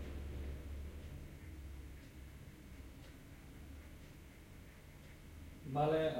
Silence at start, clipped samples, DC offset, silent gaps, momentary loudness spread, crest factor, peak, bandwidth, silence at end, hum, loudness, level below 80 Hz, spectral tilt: 0 s; under 0.1%; under 0.1%; none; 15 LU; 22 dB; -22 dBFS; 16.5 kHz; 0 s; none; -47 LUFS; -54 dBFS; -7 dB/octave